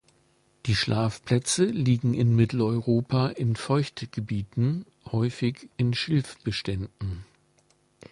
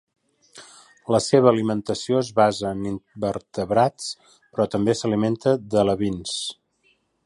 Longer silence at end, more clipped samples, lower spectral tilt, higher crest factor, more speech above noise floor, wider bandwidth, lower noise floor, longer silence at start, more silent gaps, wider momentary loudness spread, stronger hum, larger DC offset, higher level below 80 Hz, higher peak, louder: first, 0.9 s vs 0.75 s; neither; about the same, -6 dB/octave vs -5.5 dB/octave; about the same, 18 dB vs 22 dB; second, 40 dB vs 44 dB; about the same, 11.5 kHz vs 11.5 kHz; about the same, -65 dBFS vs -65 dBFS; about the same, 0.65 s vs 0.55 s; neither; second, 10 LU vs 13 LU; neither; neither; about the same, -50 dBFS vs -54 dBFS; second, -8 dBFS vs -2 dBFS; second, -26 LUFS vs -22 LUFS